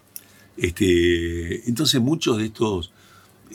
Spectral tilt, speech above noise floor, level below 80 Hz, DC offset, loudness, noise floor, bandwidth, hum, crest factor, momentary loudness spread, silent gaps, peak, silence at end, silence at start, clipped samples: -4.5 dB/octave; 23 dB; -44 dBFS; under 0.1%; -21 LUFS; -44 dBFS; 17 kHz; none; 20 dB; 14 LU; none; -2 dBFS; 0 s; 0.55 s; under 0.1%